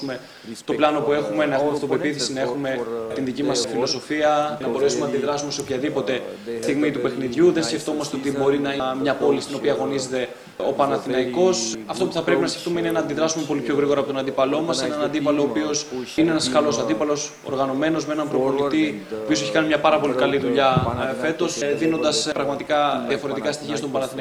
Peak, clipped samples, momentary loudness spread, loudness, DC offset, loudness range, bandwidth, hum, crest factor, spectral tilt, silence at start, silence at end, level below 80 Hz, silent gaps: -2 dBFS; under 0.1%; 7 LU; -22 LUFS; under 0.1%; 2 LU; 14.5 kHz; none; 18 dB; -4.5 dB/octave; 0 s; 0 s; -56 dBFS; none